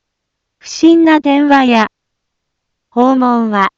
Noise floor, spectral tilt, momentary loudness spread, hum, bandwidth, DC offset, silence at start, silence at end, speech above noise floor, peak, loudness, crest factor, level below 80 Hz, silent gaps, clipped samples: -73 dBFS; -5 dB/octave; 9 LU; none; 7.6 kHz; under 0.1%; 0.65 s; 0.1 s; 64 dB; 0 dBFS; -10 LUFS; 12 dB; -56 dBFS; none; under 0.1%